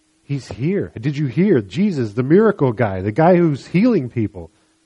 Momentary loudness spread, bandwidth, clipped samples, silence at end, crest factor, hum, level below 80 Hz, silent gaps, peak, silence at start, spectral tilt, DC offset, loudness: 12 LU; 8.8 kHz; under 0.1%; 0.4 s; 16 dB; none; -52 dBFS; none; -2 dBFS; 0.3 s; -8.5 dB/octave; under 0.1%; -18 LUFS